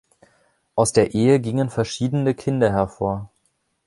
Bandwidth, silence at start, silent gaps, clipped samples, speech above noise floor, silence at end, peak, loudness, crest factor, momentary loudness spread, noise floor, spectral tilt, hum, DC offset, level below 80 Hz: 11.5 kHz; 0.75 s; none; under 0.1%; 49 dB; 0.6 s; -2 dBFS; -21 LUFS; 18 dB; 8 LU; -68 dBFS; -6 dB/octave; none; under 0.1%; -48 dBFS